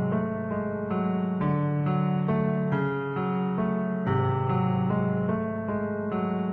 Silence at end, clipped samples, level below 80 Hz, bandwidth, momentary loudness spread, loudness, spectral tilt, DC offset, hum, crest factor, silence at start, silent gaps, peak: 0 s; under 0.1%; -56 dBFS; 4 kHz; 4 LU; -27 LUFS; -11.5 dB/octave; under 0.1%; none; 12 dB; 0 s; none; -14 dBFS